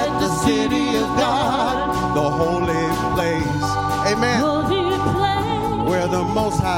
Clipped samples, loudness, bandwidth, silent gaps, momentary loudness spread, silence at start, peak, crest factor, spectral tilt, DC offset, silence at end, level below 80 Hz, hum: under 0.1%; -19 LUFS; 16.5 kHz; none; 3 LU; 0 s; -4 dBFS; 14 dB; -5.5 dB/octave; under 0.1%; 0 s; -38 dBFS; none